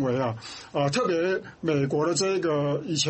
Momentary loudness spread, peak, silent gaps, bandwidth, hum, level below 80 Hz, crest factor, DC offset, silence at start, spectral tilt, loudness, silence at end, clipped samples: 6 LU; -12 dBFS; none; 8.8 kHz; none; -62 dBFS; 14 dB; under 0.1%; 0 s; -4.5 dB/octave; -26 LUFS; 0 s; under 0.1%